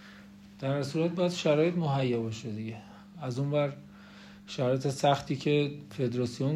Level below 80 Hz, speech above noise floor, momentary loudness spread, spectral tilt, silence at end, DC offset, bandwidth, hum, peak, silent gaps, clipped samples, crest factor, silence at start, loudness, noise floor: -66 dBFS; 22 dB; 21 LU; -6.5 dB/octave; 0 s; under 0.1%; 12 kHz; none; -12 dBFS; none; under 0.1%; 18 dB; 0 s; -30 LUFS; -51 dBFS